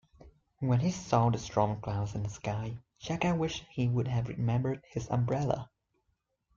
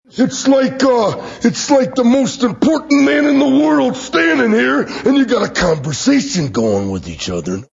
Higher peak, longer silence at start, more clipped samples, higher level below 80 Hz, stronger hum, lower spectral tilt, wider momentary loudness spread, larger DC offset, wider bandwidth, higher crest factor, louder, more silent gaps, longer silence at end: second, -12 dBFS vs 0 dBFS; about the same, 0.25 s vs 0.15 s; neither; second, -56 dBFS vs -44 dBFS; neither; first, -7 dB/octave vs -5 dB/octave; about the same, 9 LU vs 7 LU; neither; about the same, 7.4 kHz vs 7.8 kHz; first, 20 dB vs 14 dB; second, -32 LUFS vs -14 LUFS; neither; first, 0.9 s vs 0.1 s